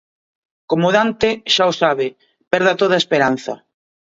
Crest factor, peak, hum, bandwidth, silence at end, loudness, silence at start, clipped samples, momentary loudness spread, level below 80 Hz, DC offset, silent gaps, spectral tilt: 18 dB; 0 dBFS; none; 7.8 kHz; 0.5 s; -16 LUFS; 0.7 s; under 0.1%; 10 LU; -56 dBFS; under 0.1%; 2.47-2.51 s; -4.5 dB/octave